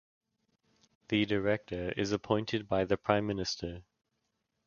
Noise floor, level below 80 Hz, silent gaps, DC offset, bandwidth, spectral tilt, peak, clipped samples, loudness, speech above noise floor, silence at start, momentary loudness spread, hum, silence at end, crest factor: -82 dBFS; -58 dBFS; none; under 0.1%; 7.2 kHz; -5.5 dB/octave; -10 dBFS; under 0.1%; -32 LUFS; 50 dB; 1.1 s; 7 LU; none; 0.85 s; 24 dB